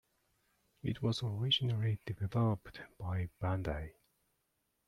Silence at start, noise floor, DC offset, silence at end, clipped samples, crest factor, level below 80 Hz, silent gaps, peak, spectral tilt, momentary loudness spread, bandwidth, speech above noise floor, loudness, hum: 0.85 s; -82 dBFS; under 0.1%; 0.95 s; under 0.1%; 18 dB; -58 dBFS; none; -20 dBFS; -6.5 dB/octave; 12 LU; 11 kHz; 46 dB; -36 LUFS; none